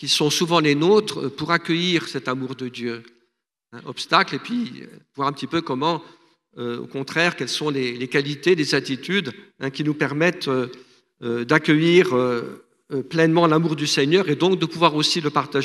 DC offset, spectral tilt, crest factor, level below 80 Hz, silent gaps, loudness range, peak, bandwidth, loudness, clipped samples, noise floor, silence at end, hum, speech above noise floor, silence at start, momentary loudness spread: under 0.1%; -4.5 dB/octave; 22 dB; -68 dBFS; none; 6 LU; 0 dBFS; 13.5 kHz; -21 LUFS; under 0.1%; -72 dBFS; 0 s; none; 51 dB; 0 s; 14 LU